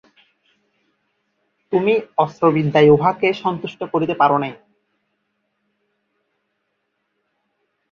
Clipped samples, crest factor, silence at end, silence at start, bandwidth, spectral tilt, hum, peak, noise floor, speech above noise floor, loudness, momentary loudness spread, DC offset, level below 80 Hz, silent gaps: under 0.1%; 20 dB; 3.35 s; 1.7 s; 6.8 kHz; -8 dB/octave; none; -2 dBFS; -72 dBFS; 56 dB; -17 LUFS; 11 LU; under 0.1%; -58 dBFS; none